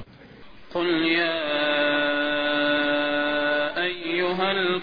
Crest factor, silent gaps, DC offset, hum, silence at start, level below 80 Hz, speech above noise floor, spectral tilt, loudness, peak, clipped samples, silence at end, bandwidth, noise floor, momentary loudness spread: 16 dB; none; 0.5%; none; 0 s; -58 dBFS; 23 dB; -6.5 dB/octave; -23 LUFS; -8 dBFS; under 0.1%; 0 s; 5.2 kHz; -46 dBFS; 4 LU